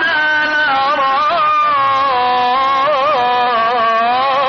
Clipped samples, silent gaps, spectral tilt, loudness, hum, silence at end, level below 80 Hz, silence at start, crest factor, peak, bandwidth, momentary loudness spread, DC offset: under 0.1%; none; 1 dB/octave; -13 LUFS; none; 0 s; -54 dBFS; 0 s; 10 dB; -4 dBFS; 6.8 kHz; 1 LU; under 0.1%